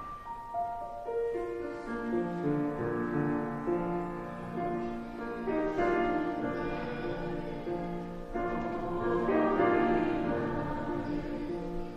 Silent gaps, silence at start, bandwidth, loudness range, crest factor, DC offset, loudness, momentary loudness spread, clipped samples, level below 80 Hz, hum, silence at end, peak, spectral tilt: none; 0 s; 8.8 kHz; 3 LU; 18 dB; under 0.1%; -33 LUFS; 10 LU; under 0.1%; -48 dBFS; none; 0 s; -14 dBFS; -8 dB/octave